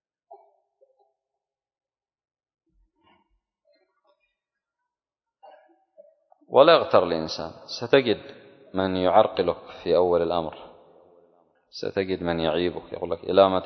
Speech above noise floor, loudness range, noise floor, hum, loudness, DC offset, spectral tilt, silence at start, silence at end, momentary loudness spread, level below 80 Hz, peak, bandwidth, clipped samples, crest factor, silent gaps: 68 dB; 5 LU; -90 dBFS; none; -23 LUFS; under 0.1%; -6 dB/octave; 0.3 s; 0 s; 16 LU; -56 dBFS; -2 dBFS; 6.4 kHz; under 0.1%; 24 dB; none